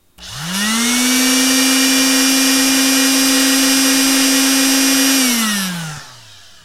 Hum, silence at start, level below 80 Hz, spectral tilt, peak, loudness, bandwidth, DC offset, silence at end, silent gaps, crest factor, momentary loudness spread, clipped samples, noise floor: none; 0.2 s; -50 dBFS; -1 dB/octave; 0 dBFS; -12 LUFS; 16 kHz; 0.2%; 0.5 s; none; 14 dB; 11 LU; under 0.1%; -41 dBFS